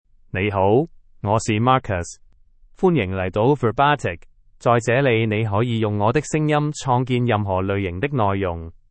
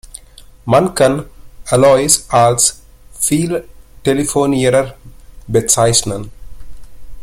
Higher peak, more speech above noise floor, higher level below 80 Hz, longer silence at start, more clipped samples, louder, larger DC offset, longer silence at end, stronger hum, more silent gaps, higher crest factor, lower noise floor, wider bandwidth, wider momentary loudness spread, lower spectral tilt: second, -4 dBFS vs 0 dBFS; first, 31 dB vs 27 dB; second, -48 dBFS vs -38 dBFS; first, 0.35 s vs 0.05 s; neither; second, -20 LUFS vs -13 LUFS; neither; first, 0.2 s vs 0 s; neither; neither; about the same, 18 dB vs 16 dB; first, -51 dBFS vs -40 dBFS; second, 8.8 kHz vs 16.5 kHz; second, 9 LU vs 14 LU; first, -6.5 dB/octave vs -4 dB/octave